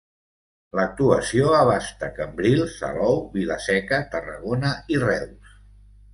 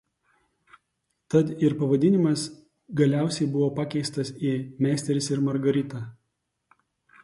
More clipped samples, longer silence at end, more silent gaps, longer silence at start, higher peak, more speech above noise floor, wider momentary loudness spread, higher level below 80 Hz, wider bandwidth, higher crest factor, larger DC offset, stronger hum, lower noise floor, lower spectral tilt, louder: neither; second, 0.8 s vs 1.1 s; neither; second, 0.75 s vs 1.3 s; first, -4 dBFS vs -8 dBFS; second, 27 dB vs 54 dB; first, 12 LU vs 9 LU; first, -46 dBFS vs -66 dBFS; about the same, 11.5 kHz vs 11.5 kHz; about the same, 18 dB vs 18 dB; neither; first, 50 Hz at -45 dBFS vs none; second, -49 dBFS vs -78 dBFS; about the same, -6 dB/octave vs -6.5 dB/octave; first, -22 LUFS vs -25 LUFS